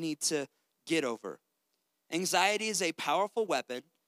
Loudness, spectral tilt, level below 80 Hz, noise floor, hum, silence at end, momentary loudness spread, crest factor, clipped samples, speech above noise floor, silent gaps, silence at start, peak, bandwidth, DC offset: -31 LUFS; -2.5 dB/octave; under -90 dBFS; -81 dBFS; none; 0.25 s; 15 LU; 22 dB; under 0.1%; 49 dB; none; 0 s; -10 dBFS; 16 kHz; under 0.1%